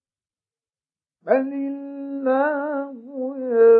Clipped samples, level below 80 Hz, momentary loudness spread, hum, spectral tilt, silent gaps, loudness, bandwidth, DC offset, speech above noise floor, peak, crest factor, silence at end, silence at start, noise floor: under 0.1%; under -90 dBFS; 11 LU; none; -10 dB/octave; none; -24 LUFS; 4.1 kHz; under 0.1%; over 71 dB; -4 dBFS; 18 dB; 0 s; 1.25 s; under -90 dBFS